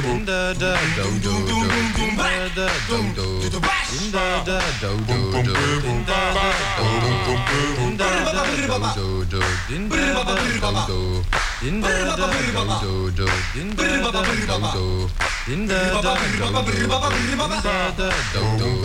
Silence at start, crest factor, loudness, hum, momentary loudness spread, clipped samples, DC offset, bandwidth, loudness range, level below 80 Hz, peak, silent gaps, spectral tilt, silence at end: 0 s; 14 dB; -21 LUFS; none; 4 LU; under 0.1%; under 0.1%; 16 kHz; 2 LU; -30 dBFS; -8 dBFS; none; -4.5 dB/octave; 0 s